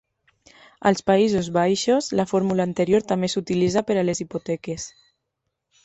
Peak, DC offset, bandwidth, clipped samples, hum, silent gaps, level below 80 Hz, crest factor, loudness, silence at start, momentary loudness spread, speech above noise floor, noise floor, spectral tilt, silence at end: -4 dBFS; under 0.1%; 8.4 kHz; under 0.1%; none; none; -56 dBFS; 18 dB; -22 LUFS; 0.85 s; 10 LU; 58 dB; -79 dBFS; -5.5 dB/octave; 0.95 s